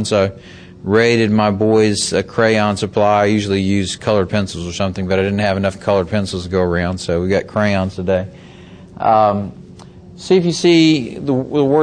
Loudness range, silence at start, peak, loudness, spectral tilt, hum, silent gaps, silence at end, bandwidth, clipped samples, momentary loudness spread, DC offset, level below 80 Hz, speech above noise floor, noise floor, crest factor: 4 LU; 0 s; 0 dBFS; -16 LUFS; -5.5 dB/octave; none; none; 0 s; 10 kHz; under 0.1%; 7 LU; under 0.1%; -44 dBFS; 23 dB; -38 dBFS; 16 dB